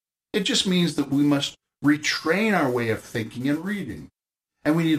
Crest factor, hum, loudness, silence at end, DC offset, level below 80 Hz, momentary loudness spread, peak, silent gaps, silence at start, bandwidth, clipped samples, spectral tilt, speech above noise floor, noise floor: 16 dB; none; -24 LUFS; 0 s; under 0.1%; -60 dBFS; 9 LU; -8 dBFS; none; 0.35 s; 15.5 kHz; under 0.1%; -4.5 dB/octave; 58 dB; -81 dBFS